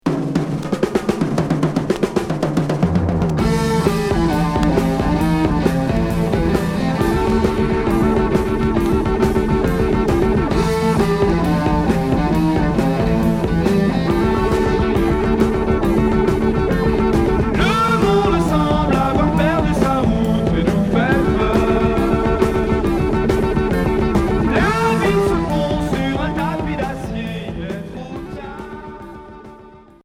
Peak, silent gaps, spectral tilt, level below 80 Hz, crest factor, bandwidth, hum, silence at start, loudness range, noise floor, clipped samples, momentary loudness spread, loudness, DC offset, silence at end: -2 dBFS; none; -7 dB/octave; -26 dBFS; 16 dB; 15.5 kHz; none; 0.05 s; 3 LU; -42 dBFS; under 0.1%; 5 LU; -17 LUFS; under 0.1%; 0.25 s